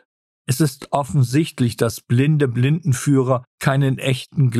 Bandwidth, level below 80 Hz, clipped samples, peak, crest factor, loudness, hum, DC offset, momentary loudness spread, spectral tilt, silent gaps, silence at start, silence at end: 14 kHz; -54 dBFS; under 0.1%; -2 dBFS; 16 dB; -19 LUFS; none; under 0.1%; 4 LU; -6.5 dB/octave; 3.47-3.58 s; 0.5 s; 0 s